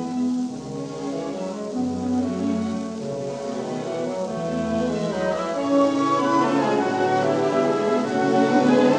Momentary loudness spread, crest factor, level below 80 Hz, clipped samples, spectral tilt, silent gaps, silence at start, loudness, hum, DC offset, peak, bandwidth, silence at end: 10 LU; 16 dB; -58 dBFS; under 0.1%; -6 dB/octave; none; 0 s; -23 LUFS; none; under 0.1%; -6 dBFS; 10 kHz; 0 s